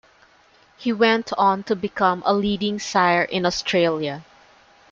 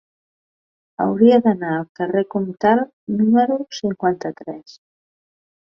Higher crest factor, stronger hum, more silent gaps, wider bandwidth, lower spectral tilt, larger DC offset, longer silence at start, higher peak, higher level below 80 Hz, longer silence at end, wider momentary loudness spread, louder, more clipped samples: about the same, 18 dB vs 18 dB; neither; second, none vs 1.89-1.95 s, 2.93-3.07 s; first, 7.8 kHz vs 6.6 kHz; second, -4.5 dB/octave vs -7 dB/octave; neither; second, 0.8 s vs 1 s; about the same, -4 dBFS vs -2 dBFS; first, -56 dBFS vs -62 dBFS; second, 0.7 s vs 1 s; second, 8 LU vs 16 LU; about the same, -21 LUFS vs -19 LUFS; neither